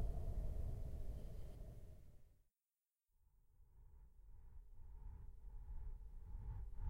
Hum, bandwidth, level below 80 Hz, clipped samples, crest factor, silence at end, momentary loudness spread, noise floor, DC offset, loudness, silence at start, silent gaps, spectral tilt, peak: none; 15.5 kHz; -50 dBFS; under 0.1%; 16 dB; 0 s; 19 LU; under -90 dBFS; under 0.1%; -54 LUFS; 0 s; none; -8.5 dB/octave; -32 dBFS